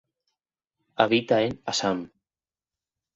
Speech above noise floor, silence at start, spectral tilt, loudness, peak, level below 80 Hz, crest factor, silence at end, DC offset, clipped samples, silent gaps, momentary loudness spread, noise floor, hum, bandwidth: over 66 dB; 1 s; -4 dB/octave; -25 LUFS; -4 dBFS; -64 dBFS; 26 dB; 1.1 s; under 0.1%; under 0.1%; none; 17 LU; under -90 dBFS; none; 8.2 kHz